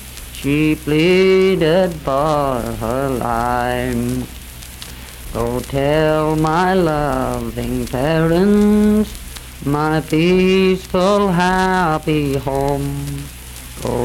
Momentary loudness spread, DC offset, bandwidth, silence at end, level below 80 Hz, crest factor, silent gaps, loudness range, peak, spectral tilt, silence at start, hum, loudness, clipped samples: 17 LU; under 0.1%; 17.5 kHz; 0 s; -32 dBFS; 12 dB; none; 4 LU; -4 dBFS; -6 dB/octave; 0 s; none; -16 LUFS; under 0.1%